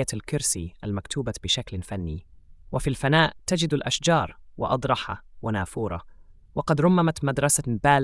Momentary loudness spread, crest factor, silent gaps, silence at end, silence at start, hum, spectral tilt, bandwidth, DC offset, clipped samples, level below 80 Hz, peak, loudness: 13 LU; 20 dB; none; 0 s; 0 s; none; -4.5 dB/octave; 12 kHz; under 0.1%; under 0.1%; -46 dBFS; -6 dBFS; -25 LUFS